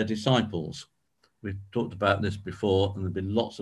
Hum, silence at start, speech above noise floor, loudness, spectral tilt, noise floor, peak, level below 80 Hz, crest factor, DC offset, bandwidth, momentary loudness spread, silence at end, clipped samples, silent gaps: none; 0 s; 42 dB; -28 LUFS; -6.5 dB/octave; -70 dBFS; -8 dBFS; -48 dBFS; 20 dB; under 0.1%; 11.5 kHz; 13 LU; 0 s; under 0.1%; none